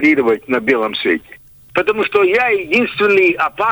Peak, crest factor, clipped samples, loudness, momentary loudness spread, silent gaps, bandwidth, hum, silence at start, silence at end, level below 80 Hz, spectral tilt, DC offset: -2 dBFS; 12 dB; under 0.1%; -15 LUFS; 6 LU; none; over 20 kHz; none; 0 s; 0 s; -54 dBFS; -5.5 dB/octave; under 0.1%